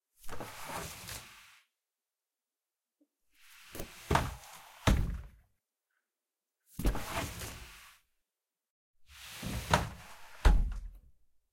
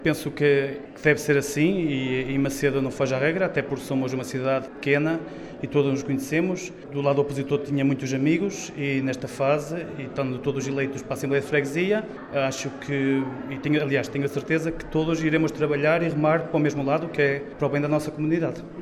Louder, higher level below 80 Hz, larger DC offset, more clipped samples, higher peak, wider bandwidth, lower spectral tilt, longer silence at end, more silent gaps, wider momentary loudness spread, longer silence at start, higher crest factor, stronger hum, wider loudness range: second, -36 LUFS vs -25 LUFS; first, -40 dBFS vs -52 dBFS; neither; neither; about the same, -6 dBFS vs -4 dBFS; first, 16.5 kHz vs 14 kHz; second, -4.5 dB/octave vs -6 dB/octave; first, 0.55 s vs 0 s; first, 8.70-8.94 s vs none; first, 21 LU vs 7 LU; first, 0.25 s vs 0 s; first, 30 dB vs 20 dB; neither; first, 11 LU vs 3 LU